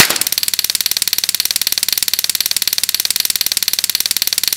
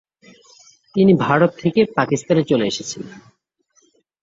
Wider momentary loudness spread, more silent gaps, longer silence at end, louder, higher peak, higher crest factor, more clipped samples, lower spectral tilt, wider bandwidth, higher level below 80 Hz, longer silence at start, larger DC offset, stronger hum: second, 1 LU vs 14 LU; neither; second, 0 s vs 1.05 s; first, -14 LUFS vs -18 LUFS; about the same, 0 dBFS vs -2 dBFS; about the same, 16 dB vs 18 dB; first, 0.5% vs under 0.1%; second, 2 dB/octave vs -6 dB/octave; first, over 20 kHz vs 7.8 kHz; first, -50 dBFS vs -58 dBFS; second, 0 s vs 0.95 s; first, 0.1% vs under 0.1%; neither